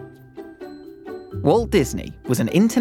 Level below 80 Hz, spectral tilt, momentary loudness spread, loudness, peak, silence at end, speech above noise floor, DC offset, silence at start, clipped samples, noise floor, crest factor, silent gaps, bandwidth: -42 dBFS; -6 dB/octave; 22 LU; -20 LUFS; -4 dBFS; 0 s; 22 dB; under 0.1%; 0 s; under 0.1%; -40 dBFS; 18 dB; none; 17 kHz